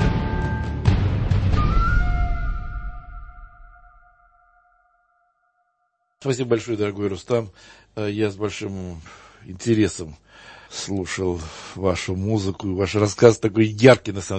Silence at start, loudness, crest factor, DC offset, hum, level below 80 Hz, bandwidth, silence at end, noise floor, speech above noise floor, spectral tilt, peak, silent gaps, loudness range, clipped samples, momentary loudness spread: 0 s; -22 LUFS; 22 dB; under 0.1%; none; -30 dBFS; 8.8 kHz; 0 s; -71 dBFS; 50 dB; -6 dB/octave; 0 dBFS; none; 11 LU; under 0.1%; 20 LU